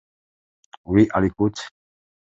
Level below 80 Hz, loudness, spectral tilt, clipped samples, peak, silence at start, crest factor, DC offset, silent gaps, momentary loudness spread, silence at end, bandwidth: -46 dBFS; -20 LUFS; -7 dB/octave; under 0.1%; -4 dBFS; 0.9 s; 20 dB; under 0.1%; none; 18 LU; 0.65 s; 8 kHz